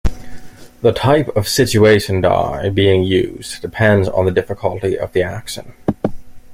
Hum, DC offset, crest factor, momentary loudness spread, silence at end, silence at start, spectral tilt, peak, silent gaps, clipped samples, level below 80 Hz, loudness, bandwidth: none; under 0.1%; 16 dB; 13 LU; 0 s; 0.05 s; -5.5 dB/octave; 0 dBFS; none; under 0.1%; -34 dBFS; -16 LUFS; 16 kHz